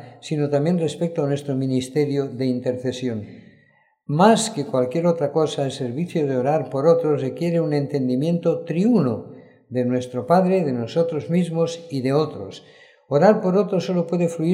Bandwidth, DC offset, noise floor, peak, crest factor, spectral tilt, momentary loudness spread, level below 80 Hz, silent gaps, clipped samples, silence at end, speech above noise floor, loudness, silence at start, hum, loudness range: 12.5 kHz; under 0.1%; -59 dBFS; -2 dBFS; 20 dB; -7 dB/octave; 9 LU; -70 dBFS; none; under 0.1%; 0 s; 39 dB; -21 LUFS; 0 s; none; 2 LU